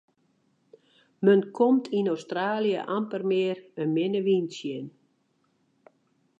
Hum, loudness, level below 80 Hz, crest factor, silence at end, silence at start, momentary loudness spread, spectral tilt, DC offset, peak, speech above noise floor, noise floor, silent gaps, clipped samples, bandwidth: none; -26 LUFS; -84 dBFS; 20 dB; 1.5 s; 1.2 s; 11 LU; -7 dB/octave; under 0.1%; -8 dBFS; 45 dB; -70 dBFS; none; under 0.1%; 8 kHz